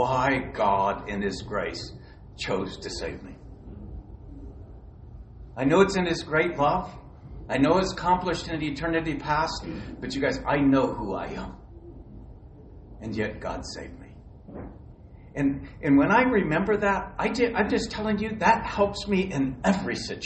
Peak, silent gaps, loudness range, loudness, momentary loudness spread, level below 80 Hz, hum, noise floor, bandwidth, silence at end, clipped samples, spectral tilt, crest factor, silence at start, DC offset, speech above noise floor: -6 dBFS; none; 12 LU; -26 LUFS; 23 LU; -44 dBFS; none; -47 dBFS; 8.4 kHz; 0 s; under 0.1%; -6 dB/octave; 22 dB; 0 s; under 0.1%; 21 dB